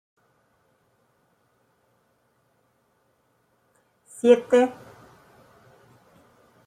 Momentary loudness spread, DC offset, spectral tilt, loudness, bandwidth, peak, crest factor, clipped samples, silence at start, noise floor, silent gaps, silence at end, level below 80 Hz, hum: 29 LU; under 0.1%; -4.5 dB/octave; -20 LUFS; 10.5 kHz; -4 dBFS; 24 dB; under 0.1%; 4.25 s; -68 dBFS; none; 1.95 s; -74 dBFS; none